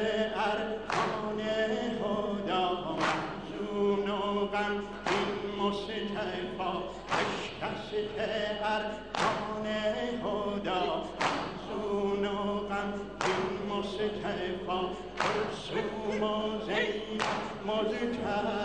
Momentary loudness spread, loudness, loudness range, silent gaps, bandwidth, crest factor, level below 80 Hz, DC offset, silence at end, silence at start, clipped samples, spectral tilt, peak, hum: 4 LU; -32 LUFS; 2 LU; none; 10 kHz; 20 dB; -56 dBFS; 0.1%; 0 s; 0 s; under 0.1%; -5 dB/octave; -14 dBFS; none